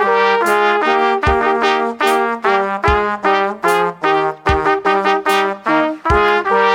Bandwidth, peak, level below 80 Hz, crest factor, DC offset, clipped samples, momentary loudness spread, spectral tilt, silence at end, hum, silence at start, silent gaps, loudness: 17 kHz; 0 dBFS; -32 dBFS; 14 dB; under 0.1%; under 0.1%; 3 LU; -5 dB/octave; 0 s; none; 0 s; none; -15 LUFS